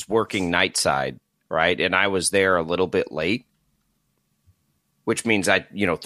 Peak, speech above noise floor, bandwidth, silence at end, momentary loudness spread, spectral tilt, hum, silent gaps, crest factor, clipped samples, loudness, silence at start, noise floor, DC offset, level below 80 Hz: -2 dBFS; 48 dB; 15.5 kHz; 0 s; 7 LU; -3.5 dB/octave; none; none; 22 dB; under 0.1%; -22 LUFS; 0 s; -70 dBFS; under 0.1%; -56 dBFS